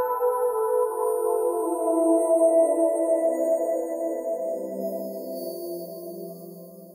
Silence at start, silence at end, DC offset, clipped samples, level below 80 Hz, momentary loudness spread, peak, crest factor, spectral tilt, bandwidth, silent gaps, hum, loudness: 0 s; 0 s; under 0.1%; under 0.1%; -72 dBFS; 17 LU; -10 dBFS; 14 dB; -5.5 dB/octave; 16.5 kHz; none; none; -24 LUFS